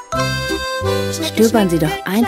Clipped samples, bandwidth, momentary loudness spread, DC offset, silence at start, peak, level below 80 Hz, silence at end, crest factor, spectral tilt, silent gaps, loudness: under 0.1%; 16 kHz; 6 LU; under 0.1%; 0 s; 0 dBFS; -36 dBFS; 0 s; 16 dB; -5 dB/octave; none; -17 LUFS